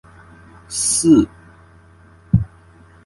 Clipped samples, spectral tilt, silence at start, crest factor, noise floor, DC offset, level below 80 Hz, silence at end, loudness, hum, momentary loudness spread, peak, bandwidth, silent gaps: under 0.1%; -5 dB/octave; 0.7 s; 20 dB; -47 dBFS; under 0.1%; -38 dBFS; 0.6 s; -17 LUFS; none; 14 LU; 0 dBFS; 11.5 kHz; none